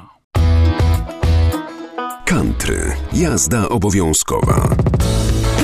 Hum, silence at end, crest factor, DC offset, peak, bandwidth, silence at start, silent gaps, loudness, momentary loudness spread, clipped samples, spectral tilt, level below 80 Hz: none; 0 s; 14 dB; under 0.1%; -2 dBFS; 15 kHz; 0 s; 0.24-0.31 s; -16 LUFS; 7 LU; under 0.1%; -5 dB/octave; -20 dBFS